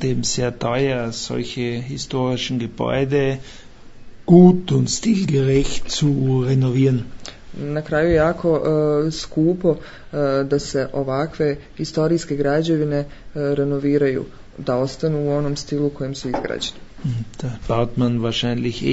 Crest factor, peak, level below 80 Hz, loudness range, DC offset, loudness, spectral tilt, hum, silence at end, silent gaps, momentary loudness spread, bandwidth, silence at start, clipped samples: 18 dB; 0 dBFS; -40 dBFS; 6 LU; under 0.1%; -20 LUFS; -6 dB/octave; none; 0 s; none; 10 LU; 8 kHz; 0 s; under 0.1%